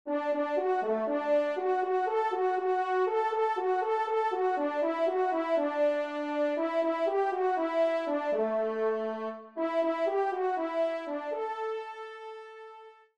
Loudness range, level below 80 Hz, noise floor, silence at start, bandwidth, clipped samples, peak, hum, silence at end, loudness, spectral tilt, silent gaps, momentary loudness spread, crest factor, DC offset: 3 LU; -82 dBFS; -51 dBFS; 0.05 s; 8.8 kHz; under 0.1%; -18 dBFS; none; 0.25 s; -30 LUFS; -5.5 dB/octave; none; 7 LU; 12 dB; under 0.1%